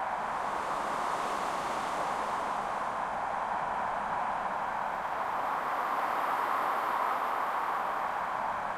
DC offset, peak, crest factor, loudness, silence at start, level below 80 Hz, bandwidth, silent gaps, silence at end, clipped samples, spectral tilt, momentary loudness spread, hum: under 0.1%; -18 dBFS; 14 dB; -32 LUFS; 0 s; -62 dBFS; 16 kHz; none; 0 s; under 0.1%; -3.5 dB/octave; 3 LU; none